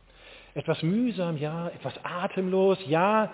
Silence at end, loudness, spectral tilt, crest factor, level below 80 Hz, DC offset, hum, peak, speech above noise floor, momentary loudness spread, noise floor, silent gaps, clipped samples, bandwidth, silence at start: 0 s; -27 LUFS; -11 dB/octave; 16 dB; -64 dBFS; under 0.1%; none; -10 dBFS; 25 dB; 12 LU; -51 dBFS; none; under 0.1%; 4 kHz; 0.25 s